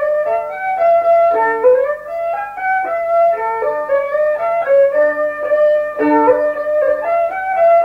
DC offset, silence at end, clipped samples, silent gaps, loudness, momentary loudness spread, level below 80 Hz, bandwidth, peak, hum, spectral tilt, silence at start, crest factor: under 0.1%; 0 s; under 0.1%; none; -15 LUFS; 7 LU; -54 dBFS; 5.4 kHz; -2 dBFS; 50 Hz at -55 dBFS; -6 dB/octave; 0 s; 12 dB